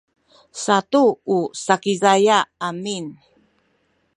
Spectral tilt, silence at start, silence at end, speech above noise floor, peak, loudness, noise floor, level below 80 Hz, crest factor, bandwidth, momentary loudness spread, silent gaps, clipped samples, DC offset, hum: -4 dB/octave; 0.55 s; 1.05 s; 47 dB; 0 dBFS; -19 LUFS; -65 dBFS; -72 dBFS; 20 dB; 11.5 kHz; 13 LU; none; under 0.1%; under 0.1%; none